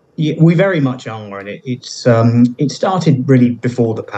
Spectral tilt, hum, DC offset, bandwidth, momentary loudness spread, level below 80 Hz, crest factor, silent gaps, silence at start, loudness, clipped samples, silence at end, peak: -7.5 dB/octave; none; under 0.1%; 8.2 kHz; 15 LU; -60 dBFS; 14 dB; none; 0.2 s; -13 LUFS; under 0.1%; 0 s; 0 dBFS